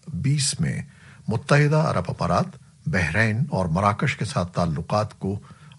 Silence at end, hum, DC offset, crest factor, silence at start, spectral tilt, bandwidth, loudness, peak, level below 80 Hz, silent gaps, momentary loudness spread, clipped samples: 0.1 s; none; under 0.1%; 20 dB; 0.05 s; -5.5 dB/octave; 11.5 kHz; -23 LUFS; -4 dBFS; -48 dBFS; none; 12 LU; under 0.1%